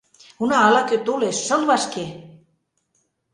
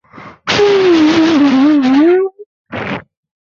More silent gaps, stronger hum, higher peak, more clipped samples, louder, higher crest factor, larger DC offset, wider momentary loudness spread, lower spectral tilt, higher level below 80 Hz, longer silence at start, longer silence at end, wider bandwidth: second, none vs 2.46-2.65 s; neither; about the same, -2 dBFS vs -2 dBFS; neither; second, -19 LUFS vs -11 LUFS; first, 20 dB vs 10 dB; neither; second, 12 LU vs 15 LU; second, -3 dB/octave vs -5 dB/octave; second, -64 dBFS vs -50 dBFS; first, 0.4 s vs 0.15 s; first, 1.05 s vs 0.4 s; first, 11 kHz vs 7.4 kHz